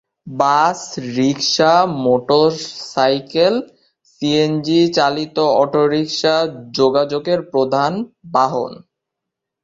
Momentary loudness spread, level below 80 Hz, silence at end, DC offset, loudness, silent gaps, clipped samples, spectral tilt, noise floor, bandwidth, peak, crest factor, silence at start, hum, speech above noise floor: 10 LU; -60 dBFS; 0.9 s; under 0.1%; -16 LUFS; none; under 0.1%; -5 dB/octave; -81 dBFS; 7.8 kHz; -2 dBFS; 16 dB; 0.25 s; none; 65 dB